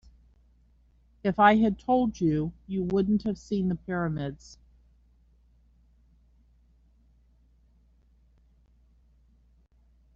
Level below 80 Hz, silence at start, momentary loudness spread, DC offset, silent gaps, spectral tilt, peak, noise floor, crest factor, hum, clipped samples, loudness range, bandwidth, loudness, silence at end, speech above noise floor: -54 dBFS; 1.25 s; 12 LU; under 0.1%; none; -6 dB/octave; -8 dBFS; -62 dBFS; 24 dB; none; under 0.1%; 13 LU; 7.4 kHz; -27 LUFS; 5.6 s; 36 dB